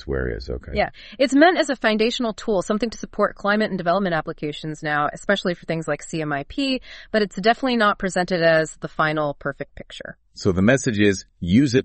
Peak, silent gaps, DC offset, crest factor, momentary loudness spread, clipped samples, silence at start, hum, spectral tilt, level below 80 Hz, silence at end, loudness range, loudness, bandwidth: -2 dBFS; none; under 0.1%; 20 dB; 11 LU; under 0.1%; 0 s; none; -5 dB/octave; -42 dBFS; 0 s; 3 LU; -21 LUFS; 8.8 kHz